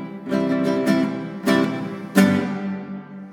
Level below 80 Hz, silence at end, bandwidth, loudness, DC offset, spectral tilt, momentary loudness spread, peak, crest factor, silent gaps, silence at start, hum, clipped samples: -70 dBFS; 0 s; 18 kHz; -21 LUFS; under 0.1%; -6.5 dB/octave; 12 LU; -2 dBFS; 20 dB; none; 0 s; none; under 0.1%